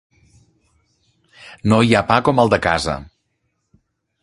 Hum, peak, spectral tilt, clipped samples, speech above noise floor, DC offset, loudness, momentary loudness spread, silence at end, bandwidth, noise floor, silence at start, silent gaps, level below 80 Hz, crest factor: none; 0 dBFS; -6 dB/octave; under 0.1%; 55 dB; under 0.1%; -16 LUFS; 11 LU; 1.2 s; 11.5 kHz; -71 dBFS; 1.45 s; none; -42 dBFS; 20 dB